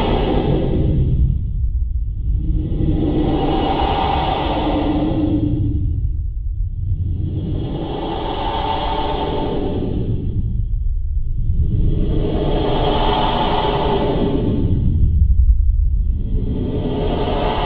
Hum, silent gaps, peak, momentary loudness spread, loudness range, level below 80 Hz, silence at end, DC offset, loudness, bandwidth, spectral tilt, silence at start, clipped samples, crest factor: none; none; -2 dBFS; 6 LU; 4 LU; -20 dBFS; 0 s; under 0.1%; -20 LUFS; 4.8 kHz; -10 dB/octave; 0 s; under 0.1%; 14 dB